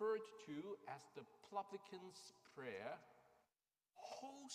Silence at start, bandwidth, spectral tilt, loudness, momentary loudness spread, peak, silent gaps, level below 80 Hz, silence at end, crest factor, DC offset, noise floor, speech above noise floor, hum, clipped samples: 0 s; 15 kHz; -4 dB/octave; -53 LUFS; 11 LU; -32 dBFS; none; under -90 dBFS; 0 s; 20 dB; under 0.1%; under -90 dBFS; over 36 dB; none; under 0.1%